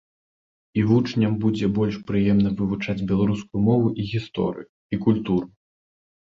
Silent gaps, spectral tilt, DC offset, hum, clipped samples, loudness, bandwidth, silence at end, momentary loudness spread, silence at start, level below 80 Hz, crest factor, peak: 4.69-4.89 s; -8.5 dB/octave; under 0.1%; none; under 0.1%; -23 LUFS; 7.2 kHz; 0.85 s; 8 LU; 0.75 s; -48 dBFS; 18 dB; -6 dBFS